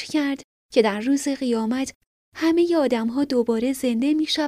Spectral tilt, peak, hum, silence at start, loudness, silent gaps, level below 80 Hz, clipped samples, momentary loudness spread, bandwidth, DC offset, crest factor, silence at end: -4 dB/octave; -6 dBFS; none; 0 s; -22 LUFS; 0.44-0.69 s, 1.95-2.32 s; -60 dBFS; under 0.1%; 6 LU; 15 kHz; under 0.1%; 16 dB; 0 s